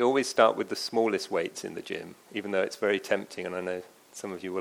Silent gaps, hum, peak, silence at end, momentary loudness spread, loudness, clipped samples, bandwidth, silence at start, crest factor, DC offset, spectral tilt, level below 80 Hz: none; none; -6 dBFS; 0 s; 15 LU; -29 LUFS; under 0.1%; 17.5 kHz; 0 s; 22 dB; under 0.1%; -3.5 dB/octave; -78 dBFS